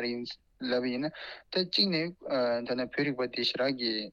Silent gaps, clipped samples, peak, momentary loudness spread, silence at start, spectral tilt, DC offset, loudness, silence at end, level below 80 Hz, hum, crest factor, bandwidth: none; under 0.1%; -12 dBFS; 11 LU; 0 s; -5.5 dB/octave; under 0.1%; -31 LUFS; 0 s; -70 dBFS; none; 18 dB; 12 kHz